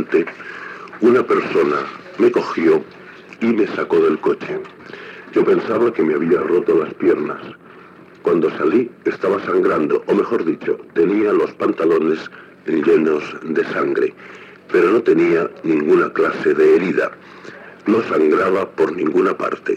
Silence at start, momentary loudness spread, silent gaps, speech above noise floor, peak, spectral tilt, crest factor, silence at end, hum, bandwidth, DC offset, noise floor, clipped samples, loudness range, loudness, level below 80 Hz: 0 s; 15 LU; none; 25 dB; -4 dBFS; -7.5 dB/octave; 14 dB; 0 s; none; 7.8 kHz; under 0.1%; -42 dBFS; under 0.1%; 3 LU; -17 LUFS; -66 dBFS